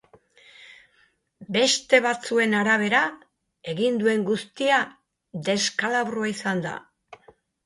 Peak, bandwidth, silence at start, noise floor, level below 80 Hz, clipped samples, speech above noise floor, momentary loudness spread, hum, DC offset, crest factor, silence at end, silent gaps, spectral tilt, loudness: -4 dBFS; 11.5 kHz; 0.6 s; -64 dBFS; -70 dBFS; under 0.1%; 41 dB; 13 LU; none; under 0.1%; 22 dB; 0.5 s; none; -3.5 dB/octave; -23 LUFS